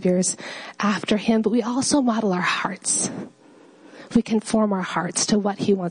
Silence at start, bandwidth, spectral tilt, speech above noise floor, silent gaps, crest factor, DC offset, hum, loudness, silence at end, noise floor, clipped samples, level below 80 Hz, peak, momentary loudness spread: 0 s; 10.5 kHz; -4 dB/octave; 28 dB; none; 16 dB; under 0.1%; none; -22 LUFS; 0 s; -50 dBFS; under 0.1%; -58 dBFS; -6 dBFS; 5 LU